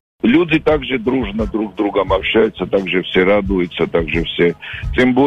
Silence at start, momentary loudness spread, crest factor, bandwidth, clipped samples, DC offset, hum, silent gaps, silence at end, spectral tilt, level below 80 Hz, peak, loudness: 0.25 s; 6 LU; 12 dB; 8.4 kHz; under 0.1%; under 0.1%; none; none; 0 s; -7.5 dB/octave; -32 dBFS; -4 dBFS; -16 LUFS